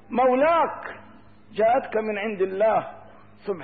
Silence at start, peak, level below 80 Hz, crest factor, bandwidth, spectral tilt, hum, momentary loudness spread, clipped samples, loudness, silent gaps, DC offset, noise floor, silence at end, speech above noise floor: 0.1 s; -12 dBFS; -62 dBFS; 12 dB; 4.7 kHz; -10 dB/octave; none; 19 LU; under 0.1%; -23 LUFS; none; 0.3%; -51 dBFS; 0 s; 29 dB